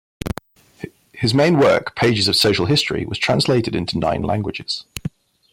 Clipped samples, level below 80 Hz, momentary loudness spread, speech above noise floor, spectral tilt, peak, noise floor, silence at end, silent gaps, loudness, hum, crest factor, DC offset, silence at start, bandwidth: under 0.1%; -44 dBFS; 18 LU; 22 dB; -5 dB/octave; -6 dBFS; -40 dBFS; 0.45 s; none; -18 LUFS; none; 14 dB; under 0.1%; 0.25 s; 16.5 kHz